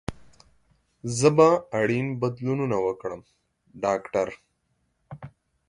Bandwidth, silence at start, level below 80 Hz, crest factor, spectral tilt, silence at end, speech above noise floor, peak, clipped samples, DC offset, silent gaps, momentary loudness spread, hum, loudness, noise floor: 11.5 kHz; 0.1 s; -56 dBFS; 22 dB; -6 dB/octave; 0.4 s; 49 dB; -4 dBFS; under 0.1%; under 0.1%; none; 21 LU; none; -24 LUFS; -72 dBFS